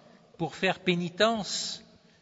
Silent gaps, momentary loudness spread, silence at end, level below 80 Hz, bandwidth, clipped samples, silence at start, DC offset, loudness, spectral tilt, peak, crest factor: none; 11 LU; 0.4 s; -66 dBFS; 8 kHz; under 0.1%; 0.4 s; under 0.1%; -29 LUFS; -4 dB/octave; -10 dBFS; 20 dB